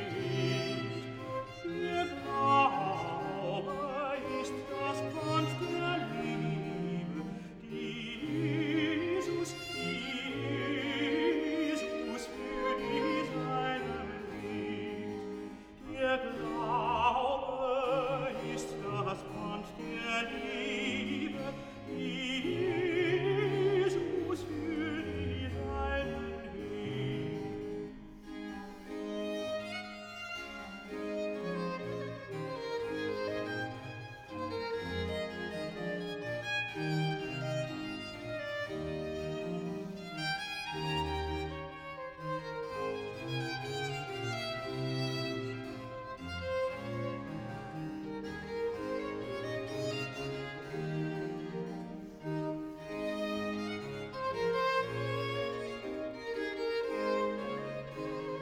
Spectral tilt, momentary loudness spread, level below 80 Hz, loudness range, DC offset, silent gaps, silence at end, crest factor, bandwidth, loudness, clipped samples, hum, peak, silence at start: -5.5 dB/octave; 10 LU; -56 dBFS; 6 LU; under 0.1%; none; 0 s; 20 dB; 17 kHz; -36 LUFS; under 0.1%; none; -16 dBFS; 0 s